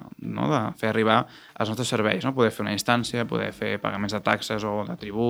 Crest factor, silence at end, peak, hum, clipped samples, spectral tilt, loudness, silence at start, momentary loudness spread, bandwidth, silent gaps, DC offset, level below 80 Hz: 22 dB; 0 s; -2 dBFS; none; under 0.1%; -5 dB/octave; -25 LUFS; 0 s; 7 LU; over 20 kHz; none; under 0.1%; -60 dBFS